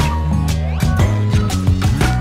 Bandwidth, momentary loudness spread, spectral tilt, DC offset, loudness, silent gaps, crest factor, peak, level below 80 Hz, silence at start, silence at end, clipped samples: 15.5 kHz; 3 LU; -6 dB/octave; under 0.1%; -17 LUFS; none; 12 dB; -2 dBFS; -22 dBFS; 0 s; 0 s; under 0.1%